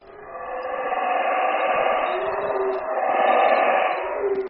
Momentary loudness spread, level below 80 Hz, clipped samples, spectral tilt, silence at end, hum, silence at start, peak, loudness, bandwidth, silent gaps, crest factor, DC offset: 11 LU; -60 dBFS; under 0.1%; -8 dB/octave; 0 s; none; 0.05 s; -6 dBFS; -22 LUFS; 5.2 kHz; none; 16 dB; under 0.1%